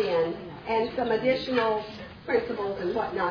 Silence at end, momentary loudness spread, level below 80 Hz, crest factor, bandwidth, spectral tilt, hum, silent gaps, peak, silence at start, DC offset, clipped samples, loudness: 0 s; 7 LU; -56 dBFS; 16 dB; 5.4 kHz; -6.5 dB/octave; none; none; -12 dBFS; 0 s; under 0.1%; under 0.1%; -28 LUFS